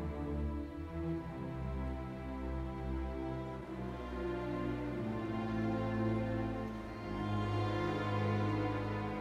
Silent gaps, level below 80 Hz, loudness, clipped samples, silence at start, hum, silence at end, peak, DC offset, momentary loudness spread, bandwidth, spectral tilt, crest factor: none; -46 dBFS; -39 LUFS; under 0.1%; 0 s; none; 0 s; -24 dBFS; under 0.1%; 7 LU; 9.4 kHz; -8 dB/octave; 14 dB